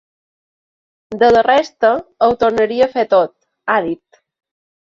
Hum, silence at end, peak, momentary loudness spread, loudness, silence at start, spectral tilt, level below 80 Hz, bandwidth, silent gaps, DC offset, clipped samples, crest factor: none; 1 s; -2 dBFS; 13 LU; -15 LUFS; 1.1 s; -5 dB/octave; -52 dBFS; 7.4 kHz; none; under 0.1%; under 0.1%; 16 dB